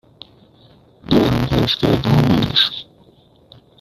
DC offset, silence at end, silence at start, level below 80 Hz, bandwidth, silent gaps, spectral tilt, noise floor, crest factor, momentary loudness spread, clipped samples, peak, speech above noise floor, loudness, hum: under 0.1%; 1 s; 1.1 s; -38 dBFS; 14.5 kHz; none; -6.5 dB/octave; -51 dBFS; 16 dB; 4 LU; under 0.1%; -2 dBFS; 35 dB; -16 LUFS; none